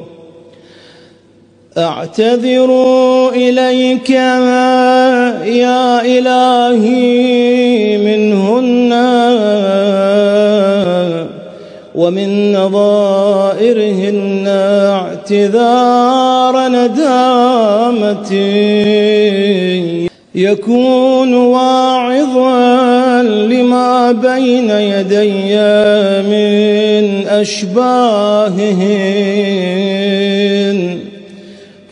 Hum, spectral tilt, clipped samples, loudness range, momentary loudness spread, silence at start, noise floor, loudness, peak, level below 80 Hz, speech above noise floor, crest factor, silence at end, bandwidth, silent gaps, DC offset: none; -6 dB/octave; under 0.1%; 3 LU; 5 LU; 0 s; -45 dBFS; -10 LUFS; 0 dBFS; -60 dBFS; 35 dB; 10 dB; 0.25 s; 10.5 kHz; none; under 0.1%